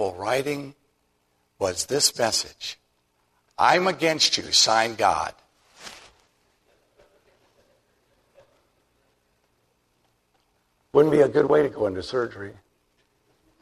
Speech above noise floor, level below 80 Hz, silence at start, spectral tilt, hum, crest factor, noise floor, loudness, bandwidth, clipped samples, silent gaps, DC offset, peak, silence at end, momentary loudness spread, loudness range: 47 dB; -62 dBFS; 0 s; -2.5 dB/octave; 60 Hz at -65 dBFS; 22 dB; -69 dBFS; -22 LUFS; 13.5 kHz; under 0.1%; none; under 0.1%; -4 dBFS; 1.1 s; 24 LU; 6 LU